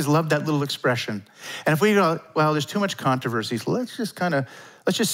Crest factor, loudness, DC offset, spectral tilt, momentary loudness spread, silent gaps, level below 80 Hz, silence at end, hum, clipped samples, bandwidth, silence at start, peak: 16 dB; -23 LUFS; under 0.1%; -5 dB/octave; 10 LU; none; -72 dBFS; 0 s; none; under 0.1%; 16 kHz; 0 s; -6 dBFS